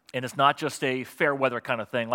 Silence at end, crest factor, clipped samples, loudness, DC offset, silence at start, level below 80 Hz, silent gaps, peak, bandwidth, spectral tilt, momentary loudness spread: 0 s; 22 dB; under 0.1%; -26 LUFS; under 0.1%; 0.15 s; -78 dBFS; none; -6 dBFS; 17 kHz; -4.5 dB/octave; 6 LU